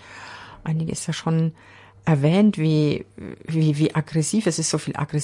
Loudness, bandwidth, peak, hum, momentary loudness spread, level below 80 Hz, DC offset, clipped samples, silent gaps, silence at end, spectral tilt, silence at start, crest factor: -22 LUFS; 11.5 kHz; -6 dBFS; none; 17 LU; -56 dBFS; under 0.1%; under 0.1%; none; 0 s; -6 dB/octave; 0.05 s; 16 dB